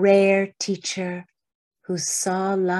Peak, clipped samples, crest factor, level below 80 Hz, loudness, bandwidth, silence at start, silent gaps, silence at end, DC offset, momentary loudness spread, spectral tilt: -4 dBFS; under 0.1%; 18 dB; -72 dBFS; -23 LUFS; 12.5 kHz; 0 s; 1.55-1.71 s; 0 s; under 0.1%; 14 LU; -4 dB/octave